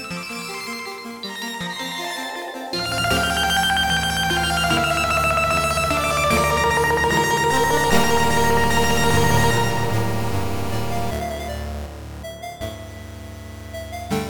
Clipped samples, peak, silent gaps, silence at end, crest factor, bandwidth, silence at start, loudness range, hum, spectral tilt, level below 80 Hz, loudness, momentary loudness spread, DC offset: under 0.1%; -4 dBFS; none; 0 s; 18 dB; 19 kHz; 0 s; 10 LU; none; -3.5 dB/octave; -36 dBFS; -20 LUFS; 15 LU; under 0.1%